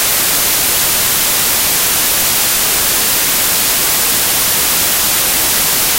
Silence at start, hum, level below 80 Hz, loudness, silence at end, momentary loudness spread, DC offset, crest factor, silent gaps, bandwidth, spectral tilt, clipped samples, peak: 0 s; none; -38 dBFS; -10 LUFS; 0 s; 0 LU; under 0.1%; 12 dB; none; 16.5 kHz; 0 dB/octave; under 0.1%; 0 dBFS